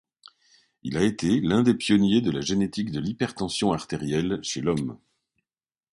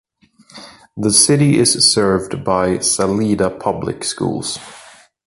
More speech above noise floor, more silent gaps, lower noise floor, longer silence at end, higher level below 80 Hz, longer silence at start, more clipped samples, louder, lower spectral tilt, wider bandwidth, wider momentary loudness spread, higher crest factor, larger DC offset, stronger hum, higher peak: first, over 66 dB vs 35 dB; neither; first, under -90 dBFS vs -51 dBFS; first, 1 s vs 0.4 s; second, -52 dBFS vs -46 dBFS; first, 0.85 s vs 0.55 s; neither; second, -25 LUFS vs -15 LUFS; first, -5.5 dB/octave vs -3.5 dB/octave; about the same, 11.5 kHz vs 12 kHz; second, 8 LU vs 11 LU; about the same, 18 dB vs 18 dB; neither; neither; second, -8 dBFS vs 0 dBFS